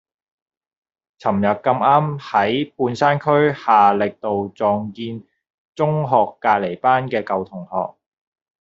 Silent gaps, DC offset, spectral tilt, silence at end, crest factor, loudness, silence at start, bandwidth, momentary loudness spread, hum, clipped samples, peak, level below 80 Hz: 5.54-5.73 s; under 0.1%; -5 dB/octave; 0.7 s; 18 dB; -19 LUFS; 1.25 s; 7.6 kHz; 11 LU; none; under 0.1%; -2 dBFS; -62 dBFS